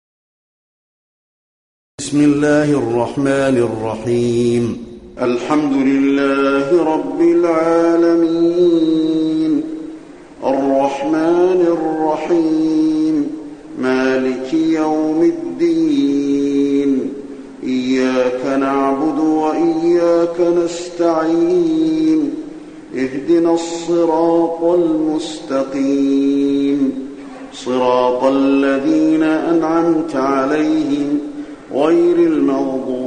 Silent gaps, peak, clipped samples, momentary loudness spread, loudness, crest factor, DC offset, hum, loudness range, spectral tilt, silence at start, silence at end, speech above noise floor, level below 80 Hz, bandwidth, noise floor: none; -2 dBFS; under 0.1%; 9 LU; -15 LUFS; 14 dB; under 0.1%; none; 3 LU; -6 dB/octave; 2 s; 0 s; 21 dB; -52 dBFS; 10.5 kHz; -35 dBFS